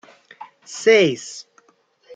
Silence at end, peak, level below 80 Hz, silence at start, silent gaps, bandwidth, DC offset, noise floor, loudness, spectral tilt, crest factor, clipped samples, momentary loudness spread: 0.75 s; -2 dBFS; -72 dBFS; 0.7 s; none; 9.2 kHz; under 0.1%; -60 dBFS; -17 LUFS; -3.5 dB/octave; 20 dB; under 0.1%; 21 LU